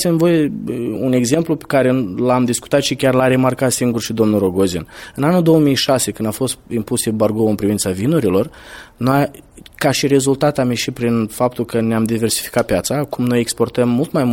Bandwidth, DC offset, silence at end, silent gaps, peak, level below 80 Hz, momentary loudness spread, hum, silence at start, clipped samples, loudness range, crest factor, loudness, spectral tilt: 17 kHz; under 0.1%; 0 s; none; 0 dBFS; -46 dBFS; 6 LU; none; 0 s; under 0.1%; 2 LU; 16 dB; -16 LUFS; -5 dB/octave